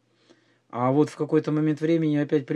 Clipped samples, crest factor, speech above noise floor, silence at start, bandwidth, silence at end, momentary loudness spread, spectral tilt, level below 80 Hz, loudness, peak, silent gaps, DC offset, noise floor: under 0.1%; 16 dB; 38 dB; 0.75 s; 10 kHz; 0 s; 3 LU; -8.5 dB/octave; -80 dBFS; -24 LUFS; -8 dBFS; none; under 0.1%; -60 dBFS